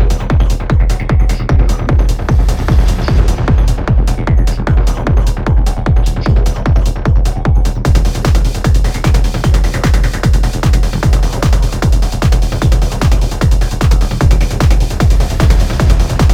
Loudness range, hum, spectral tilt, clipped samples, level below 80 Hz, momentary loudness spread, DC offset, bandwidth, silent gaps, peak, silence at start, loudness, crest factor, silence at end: 1 LU; none; -6 dB/octave; under 0.1%; -12 dBFS; 2 LU; under 0.1%; 14.5 kHz; none; 0 dBFS; 0 s; -13 LUFS; 10 dB; 0 s